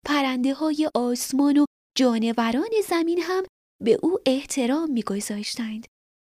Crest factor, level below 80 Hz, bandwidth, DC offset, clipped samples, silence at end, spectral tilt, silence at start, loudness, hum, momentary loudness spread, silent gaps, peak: 16 dB; -62 dBFS; 15.5 kHz; under 0.1%; under 0.1%; 0.55 s; -4 dB/octave; 0.05 s; -24 LUFS; none; 7 LU; 1.67-1.90 s, 3.49-3.79 s; -6 dBFS